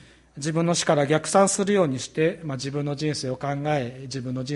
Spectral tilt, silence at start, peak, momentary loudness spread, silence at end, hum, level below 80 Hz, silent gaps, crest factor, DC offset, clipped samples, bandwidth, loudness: -5 dB/octave; 0.35 s; -6 dBFS; 11 LU; 0 s; none; -60 dBFS; none; 18 dB; under 0.1%; under 0.1%; 11.5 kHz; -24 LUFS